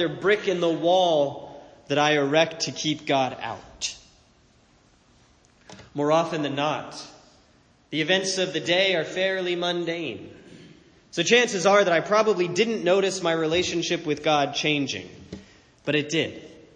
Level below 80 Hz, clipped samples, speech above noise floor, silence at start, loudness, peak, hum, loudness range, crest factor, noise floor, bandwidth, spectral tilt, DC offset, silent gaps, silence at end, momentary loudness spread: -62 dBFS; under 0.1%; 36 dB; 0 s; -23 LUFS; -4 dBFS; none; 8 LU; 20 dB; -59 dBFS; 10 kHz; -3.5 dB/octave; under 0.1%; none; 0.2 s; 15 LU